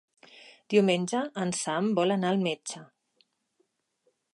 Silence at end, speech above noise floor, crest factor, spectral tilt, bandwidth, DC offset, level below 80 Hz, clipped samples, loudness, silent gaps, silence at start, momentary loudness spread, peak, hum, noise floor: 1.5 s; 48 dB; 20 dB; -5 dB/octave; 11.5 kHz; under 0.1%; -78 dBFS; under 0.1%; -27 LUFS; none; 0.45 s; 11 LU; -10 dBFS; none; -75 dBFS